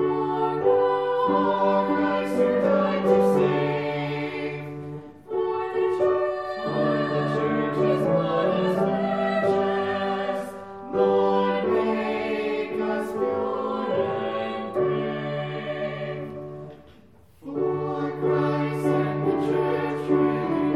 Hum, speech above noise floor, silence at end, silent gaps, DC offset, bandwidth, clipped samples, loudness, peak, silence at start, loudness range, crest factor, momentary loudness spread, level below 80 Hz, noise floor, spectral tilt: none; 32 dB; 0 s; none; 0.1%; 12.5 kHz; under 0.1%; -24 LUFS; -8 dBFS; 0 s; 6 LU; 16 dB; 10 LU; -62 dBFS; -53 dBFS; -7.5 dB/octave